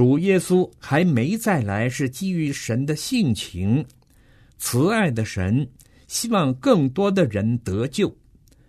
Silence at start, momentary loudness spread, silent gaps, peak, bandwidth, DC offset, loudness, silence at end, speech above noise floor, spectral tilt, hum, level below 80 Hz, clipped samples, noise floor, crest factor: 0 s; 6 LU; none; -2 dBFS; 13.5 kHz; under 0.1%; -22 LUFS; 0.55 s; 33 dB; -6 dB/octave; none; -52 dBFS; under 0.1%; -53 dBFS; 18 dB